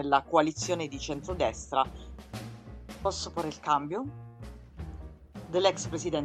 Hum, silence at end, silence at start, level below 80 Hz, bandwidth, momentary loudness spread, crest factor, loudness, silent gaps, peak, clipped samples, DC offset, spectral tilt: none; 0 s; 0 s; -48 dBFS; 14.5 kHz; 20 LU; 22 dB; -30 LUFS; none; -10 dBFS; under 0.1%; under 0.1%; -4.5 dB/octave